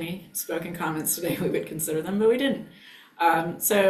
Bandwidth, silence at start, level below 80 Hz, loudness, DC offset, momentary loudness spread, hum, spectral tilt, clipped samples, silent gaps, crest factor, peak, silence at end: 16 kHz; 0 s; -62 dBFS; -26 LUFS; under 0.1%; 9 LU; none; -4 dB/octave; under 0.1%; none; 16 dB; -10 dBFS; 0 s